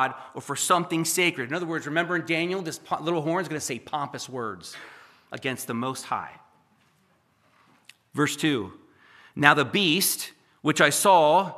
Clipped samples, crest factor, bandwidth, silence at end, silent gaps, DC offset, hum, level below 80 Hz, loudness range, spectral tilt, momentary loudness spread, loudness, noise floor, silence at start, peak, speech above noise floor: under 0.1%; 26 dB; 15 kHz; 0 s; none; under 0.1%; none; -74 dBFS; 11 LU; -3 dB/octave; 17 LU; -24 LUFS; -65 dBFS; 0 s; 0 dBFS; 40 dB